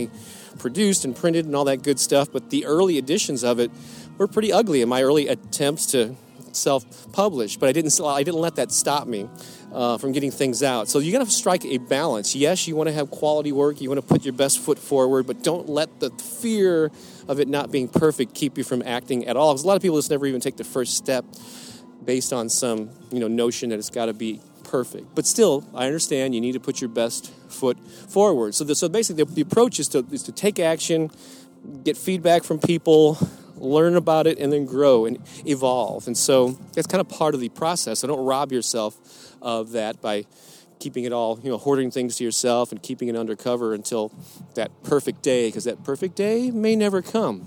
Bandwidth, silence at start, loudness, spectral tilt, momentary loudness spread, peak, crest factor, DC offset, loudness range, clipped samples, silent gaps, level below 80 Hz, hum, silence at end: 19 kHz; 0 s; -22 LUFS; -4 dB/octave; 10 LU; -2 dBFS; 20 dB; under 0.1%; 5 LU; under 0.1%; none; -66 dBFS; none; 0 s